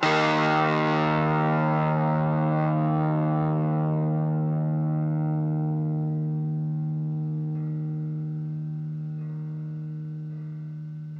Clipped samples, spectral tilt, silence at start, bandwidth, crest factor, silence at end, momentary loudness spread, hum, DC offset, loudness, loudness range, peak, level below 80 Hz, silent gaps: under 0.1%; -8 dB/octave; 0 s; 7 kHz; 18 dB; 0 s; 12 LU; none; under 0.1%; -26 LUFS; 8 LU; -8 dBFS; -62 dBFS; none